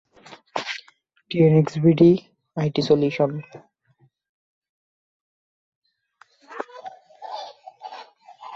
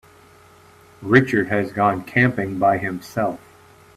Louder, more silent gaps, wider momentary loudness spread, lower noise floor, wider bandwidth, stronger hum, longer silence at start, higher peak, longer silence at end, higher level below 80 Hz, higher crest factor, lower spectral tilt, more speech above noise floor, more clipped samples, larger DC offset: about the same, -20 LUFS vs -20 LUFS; first, 4.29-4.62 s, 4.69-5.82 s vs none; first, 25 LU vs 10 LU; first, -63 dBFS vs -49 dBFS; second, 7.6 kHz vs 14.5 kHz; neither; second, 0.3 s vs 1 s; second, -4 dBFS vs 0 dBFS; second, 0 s vs 0.6 s; second, -62 dBFS vs -56 dBFS; about the same, 20 dB vs 20 dB; about the same, -8 dB/octave vs -7.5 dB/octave; first, 44 dB vs 30 dB; neither; neither